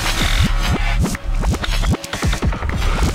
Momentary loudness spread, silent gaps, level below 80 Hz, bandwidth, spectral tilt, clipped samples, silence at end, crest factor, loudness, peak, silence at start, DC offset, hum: 4 LU; none; -20 dBFS; 16 kHz; -4.5 dB/octave; under 0.1%; 0 s; 14 dB; -20 LUFS; -2 dBFS; 0 s; under 0.1%; none